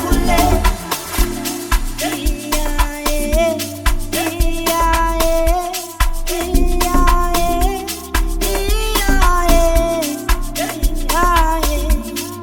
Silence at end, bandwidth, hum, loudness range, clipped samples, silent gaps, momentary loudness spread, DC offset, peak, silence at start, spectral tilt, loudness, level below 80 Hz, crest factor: 0 s; 19 kHz; none; 3 LU; under 0.1%; none; 7 LU; under 0.1%; 0 dBFS; 0 s; -4 dB/octave; -18 LUFS; -18 dBFS; 16 dB